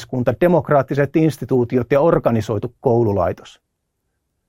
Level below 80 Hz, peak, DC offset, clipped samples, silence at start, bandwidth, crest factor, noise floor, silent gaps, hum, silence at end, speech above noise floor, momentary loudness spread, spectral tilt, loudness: -46 dBFS; 0 dBFS; under 0.1%; under 0.1%; 0 s; 16 kHz; 16 dB; -73 dBFS; none; none; 1 s; 56 dB; 6 LU; -8.5 dB/octave; -17 LUFS